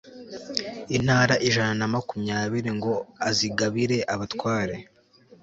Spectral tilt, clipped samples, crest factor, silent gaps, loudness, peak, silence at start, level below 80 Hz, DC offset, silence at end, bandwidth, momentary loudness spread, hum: -4.5 dB/octave; under 0.1%; 20 dB; none; -25 LUFS; -6 dBFS; 0.05 s; -56 dBFS; under 0.1%; 0.6 s; 8 kHz; 10 LU; none